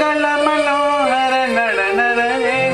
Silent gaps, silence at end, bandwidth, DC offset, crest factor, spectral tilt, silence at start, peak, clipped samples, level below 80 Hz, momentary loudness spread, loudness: none; 0 s; 13.5 kHz; under 0.1%; 14 dB; -3.5 dB/octave; 0 s; -2 dBFS; under 0.1%; -52 dBFS; 1 LU; -15 LUFS